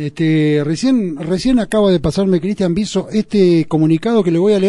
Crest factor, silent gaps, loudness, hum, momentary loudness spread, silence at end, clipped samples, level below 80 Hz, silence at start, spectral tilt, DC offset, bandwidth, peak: 12 dB; none; -15 LUFS; none; 5 LU; 0 s; under 0.1%; -38 dBFS; 0 s; -7 dB/octave; under 0.1%; 12 kHz; -2 dBFS